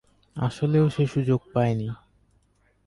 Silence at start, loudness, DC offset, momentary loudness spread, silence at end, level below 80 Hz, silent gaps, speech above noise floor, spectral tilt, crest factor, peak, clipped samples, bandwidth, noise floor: 0.35 s; -25 LUFS; under 0.1%; 14 LU; 0.9 s; -54 dBFS; none; 42 dB; -8.5 dB/octave; 16 dB; -10 dBFS; under 0.1%; 11.5 kHz; -65 dBFS